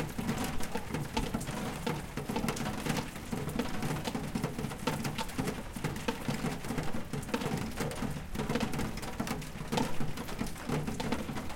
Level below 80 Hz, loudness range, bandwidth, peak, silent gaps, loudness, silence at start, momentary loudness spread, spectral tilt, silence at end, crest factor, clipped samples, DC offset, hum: -46 dBFS; 1 LU; 17 kHz; -14 dBFS; none; -36 LUFS; 0 s; 4 LU; -5 dB/octave; 0 s; 20 dB; under 0.1%; under 0.1%; none